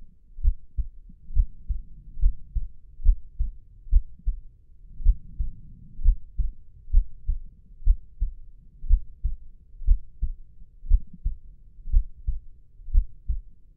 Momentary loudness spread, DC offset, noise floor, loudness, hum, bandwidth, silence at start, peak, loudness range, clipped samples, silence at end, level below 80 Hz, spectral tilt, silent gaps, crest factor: 18 LU; under 0.1%; -46 dBFS; -32 LUFS; none; 0.3 kHz; 0 s; -6 dBFS; 1 LU; under 0.1%; 0.35 s; -26 dBFS; -15.5 dB/octave; none; 18 dB